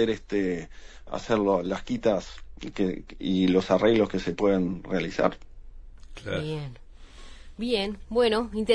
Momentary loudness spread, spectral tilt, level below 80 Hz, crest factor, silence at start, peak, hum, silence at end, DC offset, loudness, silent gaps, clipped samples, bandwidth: 16 LU; -6 dB/octave; -46 dBFS; 20 dB; 0 s; -8 dBFS; none; 0 s; under 0.1%; -27 LUFS; none; under 0.1%; 10.5 kHz